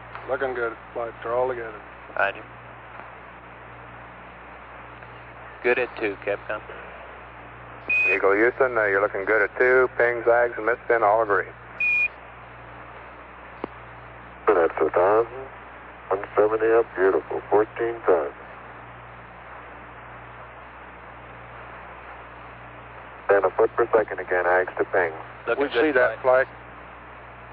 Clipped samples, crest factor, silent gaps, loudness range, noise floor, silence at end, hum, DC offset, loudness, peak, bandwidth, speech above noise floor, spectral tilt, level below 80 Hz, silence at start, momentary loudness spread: under 0.1%; 18 dB; none; 18 LU; -43 dBFS; 0 s; none; under 0.1%; -22 LUFS; -8 dBFS; 5.4 kHz; 20 dB; -7.5 dB/octave; -54 dBFS; 0 s; 22 LU